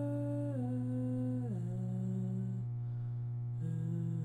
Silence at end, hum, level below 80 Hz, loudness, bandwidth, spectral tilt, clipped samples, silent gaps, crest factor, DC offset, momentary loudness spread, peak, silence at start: 0 s; 60 Hz at -40 dBFS; -64 dBFS; -38 LUFS; 8 kHz; -10.5 dB/octave; under 0.1%; none; 10 dB; under 0.1%; 3 LU; -28 dBFS; 0 s